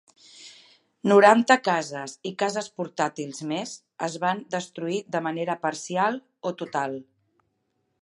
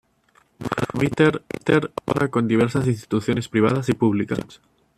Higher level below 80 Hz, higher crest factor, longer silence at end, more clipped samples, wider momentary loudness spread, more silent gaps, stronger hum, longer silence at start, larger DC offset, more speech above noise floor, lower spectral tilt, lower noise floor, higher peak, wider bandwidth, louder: second, -80 dBFS vs -52 dBFS; first, 24 dB vs 18 dB; first, 1 s vs 0.45 s; neither; first, 16 LU vs 8 LU; neither; neither; second, 0.35 s vs 0.6 s; neither; first, 50 dB vs 39 dB; second, -4.5 dB/octave vs -7 dB/octave; first, -75 dBFS vs -60 dBFS; about the same, -2 dBFS vs -4 dBFS; second, 11.5 kHz vs 14 kHz; second, -25 LUFS vs -22 LUFS